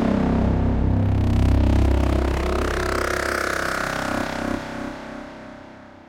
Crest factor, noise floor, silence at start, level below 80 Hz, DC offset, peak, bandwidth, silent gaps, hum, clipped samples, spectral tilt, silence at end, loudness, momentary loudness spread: 14 dB; -42 dBFS; 0 s; -26 dBFS; under 0.1%; -8 dBFS; 16 kHz; none; none; under 0.1%; -6.5 dB/octave; 0.2 s; -22 LUFS; 17 LU